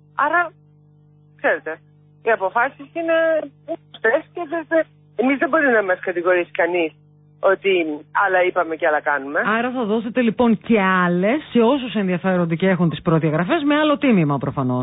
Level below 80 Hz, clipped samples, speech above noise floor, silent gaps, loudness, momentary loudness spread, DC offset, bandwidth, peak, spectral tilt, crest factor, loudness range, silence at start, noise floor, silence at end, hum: -58 dBFS; under 0.1%; 33 dB; none; -19 LUFS; 7 LU; under 0.1%; 4 kHz; -6 dBFS; -11.5 dB/octave; 14 dB; 4 LU; 0.15 s; -51 dBFS; 0 s; 50 Hz at -50 dBFS